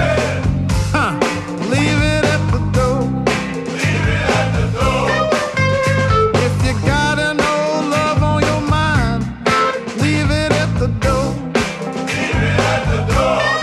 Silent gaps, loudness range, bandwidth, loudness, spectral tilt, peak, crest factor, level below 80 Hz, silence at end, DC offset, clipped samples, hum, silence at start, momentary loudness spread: none; 2 LU; 13 kHz; -16 LUFS; -5.5 dB/octave; -2 dBFS; 14 dB; -28 dBFS; 0 s; under 0.1%; under 0.1%; none; 0 s; 4 LU